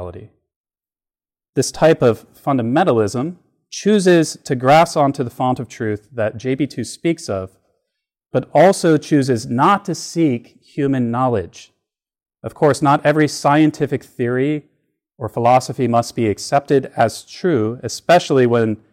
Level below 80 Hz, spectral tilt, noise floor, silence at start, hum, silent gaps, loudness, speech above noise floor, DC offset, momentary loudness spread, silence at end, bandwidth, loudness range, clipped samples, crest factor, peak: -56 dBFS; -6 dB/octave; under -90 dBFS; 0 s; none; 0.56-0.64 s, 1.49-1.53 s; -17 LUFS; over 74 dB; under 0.1%; 12 LU; 0.15 s; 16 kHz; 3 LU; under 0.1%; 14 dB; -4 dBFS